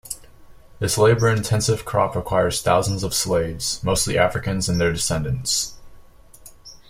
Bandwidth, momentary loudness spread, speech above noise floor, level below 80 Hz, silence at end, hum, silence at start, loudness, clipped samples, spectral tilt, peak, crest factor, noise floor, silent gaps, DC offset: 16.5 kHz; 6 LU; 25 dB; -42 dBFS; 0.15 s; none; 0.05 s; -21 LUFS; under 0.1%; -4 dB/octave; -4 dBFS; 18 dB; -45 dBFS; none; under 0.1%